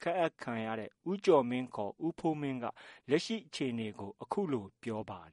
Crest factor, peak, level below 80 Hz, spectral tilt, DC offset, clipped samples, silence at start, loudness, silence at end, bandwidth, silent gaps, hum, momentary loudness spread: 20 dB; -14 dBFS; -74 dBFS; -6 dB/octave; under 0.1%; under 0.1%; 0 s; -35 LUFS; 0.05 s; 11.5 kHz; none; none; 12 LU